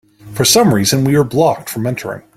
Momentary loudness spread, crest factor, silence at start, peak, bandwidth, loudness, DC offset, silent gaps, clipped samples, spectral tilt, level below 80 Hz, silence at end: 11 LU; 14 dB; 0.25 s; 0 dBFS; 16.5 kHz; -13 LUFS; under 0.1%; none; under 0.1%; -4.5 dB/octave; -48 dBFS; 0.15 s